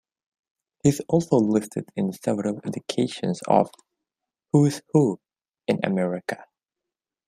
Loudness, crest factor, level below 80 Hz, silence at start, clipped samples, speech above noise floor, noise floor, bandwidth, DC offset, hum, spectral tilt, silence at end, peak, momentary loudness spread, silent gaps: -24 LUFS; 22 dB; -64 dBFS; 0.85 s; under 0.1%; 65 dB; -88 dBFS; 15 kHz; under 0.1%; none; -6.5 dB/octave; 0.85 s; -4 dBFS; 11 LU; none